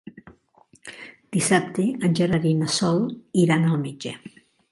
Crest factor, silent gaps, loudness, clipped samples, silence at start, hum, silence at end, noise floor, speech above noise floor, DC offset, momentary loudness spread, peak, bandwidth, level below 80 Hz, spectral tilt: 18 dB; none; -22 LUFS; under 0.1%; 0.05 s; none; 0.45 s; -58 dBFS; 36 dB; under 0.1%; 20 LU; -4 dBFS; 11.5 kHz; -60 dBFS; -5.5 dB/octave